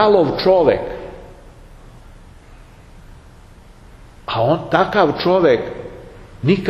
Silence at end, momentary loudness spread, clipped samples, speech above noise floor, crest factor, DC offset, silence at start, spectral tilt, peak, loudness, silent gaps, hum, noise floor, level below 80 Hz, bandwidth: 0 s; 21 LU; under 0.1%; 28 dB; 18 dB; under 0.1%; 0 s; -7.5 dB/octave; 0 dBFS; -16 LUFS; none; none; -42 dBFS; -42 dBFS; 12.5 kHz